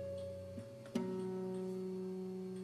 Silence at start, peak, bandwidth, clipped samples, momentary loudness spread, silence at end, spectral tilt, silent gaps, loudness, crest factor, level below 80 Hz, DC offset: 0 s; -26 dBFS; 13.5 kHz; under 0.1%; 7 LU; 0 s; -7.5 dB/octave; none; -44 LUFS; 18 dB; -76 dBFS; under 0.1%